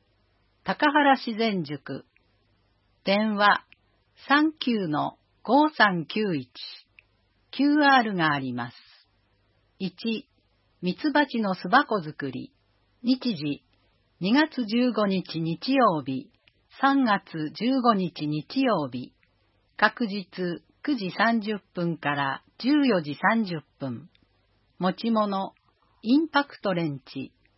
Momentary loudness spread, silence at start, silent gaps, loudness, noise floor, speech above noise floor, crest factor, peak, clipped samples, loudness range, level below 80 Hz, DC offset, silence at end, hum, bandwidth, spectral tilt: 15 LU; 0.65 s; none; -25 LUFS; -67 dBFS; 42 dB; 24 dB; -4 dBFS; under 0.1%; 4 LU; -72 dBFS; under 0.1%; 0.3 s; none; 5.8 kHz; -9.5 dB/octave